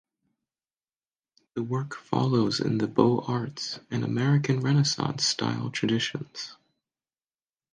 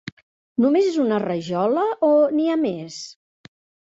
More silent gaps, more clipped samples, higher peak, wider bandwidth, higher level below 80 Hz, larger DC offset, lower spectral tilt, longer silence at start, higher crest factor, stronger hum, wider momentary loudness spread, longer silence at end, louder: second, none vs 0.12-0.17 s, 0.23-0.56 s; neither; first, -4 dBFS vs -8 dBFS; first, 9.8 kHz vs 8 kHz; about the same, -66 dBFS vs -66 dBFS; neither; about the same, -5.5 dB/octave vs -6.5 dB/octave; first, 1.55 s vs 0.05 s; first, 24 dB vs 14 dB; neither; second, 12 LU vs 17 LU; first, 1.2 s vs 0.7 s; second, -27 LUFS vs -20 LUFS